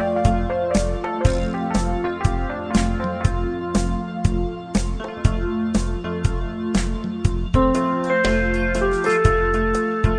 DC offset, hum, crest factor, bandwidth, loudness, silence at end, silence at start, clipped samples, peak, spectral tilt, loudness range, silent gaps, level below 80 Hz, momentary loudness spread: under 0.1%; none; 18 dB; 10 kHz; -22 LUFS; 0 s; 0 s; under 0.1%; -2 dBFS; -6.5 dB/octave; 4 LU; none; -26 dBFS; 6 LU